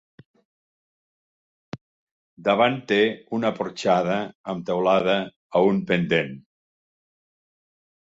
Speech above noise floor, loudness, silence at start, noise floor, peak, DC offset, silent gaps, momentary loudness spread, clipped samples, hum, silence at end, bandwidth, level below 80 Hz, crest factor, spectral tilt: over 68 dB; -23 LUFS; 1.75 s; under -90 dBFS; -6 dBFS; under 0.1%; 1.81-2.37 s, 4.35-4.44 s, 5.36-5.50 s; 16 LU; under 0.1%; none; 1.65 s; 7.8 kHz; -64 dBFS; 20 dB; -6 dB/octave